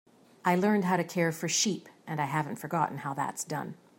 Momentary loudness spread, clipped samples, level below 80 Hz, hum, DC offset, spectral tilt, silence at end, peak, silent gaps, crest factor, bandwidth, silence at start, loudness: 9 LU; under 0.1%; -76 dBFS; none; under 0.1%; -4 dB/octave; 0.25 s; -12 dBFS; none; 18 dB; 16.5 kHz; 0.45 s; -30 LUFS